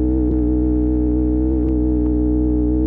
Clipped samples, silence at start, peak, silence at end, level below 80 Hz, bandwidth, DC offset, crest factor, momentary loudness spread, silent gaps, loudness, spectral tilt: under 0.1%; 0 s; -8 dBFS; 0 s; -20 dBFS; 1.9 kHz; under 0.1%; 8 dB; 0 LU; none; -18 LUFS; -14 dB/octave